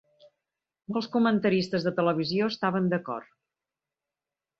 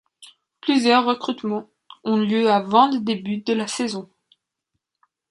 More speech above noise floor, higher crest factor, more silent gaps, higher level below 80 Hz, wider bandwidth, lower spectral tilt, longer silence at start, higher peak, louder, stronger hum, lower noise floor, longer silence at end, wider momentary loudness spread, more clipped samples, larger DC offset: first, 64 dB vs 59 dB; about the same, 18 dB vs 20 dB; neither; about the same, -70 dBFS vs -70 dBFS; second, 7.8 kHz vs 11.5 kHz; first, -7 dB/octave vs -4.5 dB/octave; first, 0.9 s vs 0.2 s; second, -12 dBFS vs -2 dBFS; second, -27 LUFS vs -21 LUFS; neither; first, -90 dBFS vs -79 dBFS; about the same, 1.35 s vs 1.25 s; about the same, 9 LU vs 11 LU; neither; neither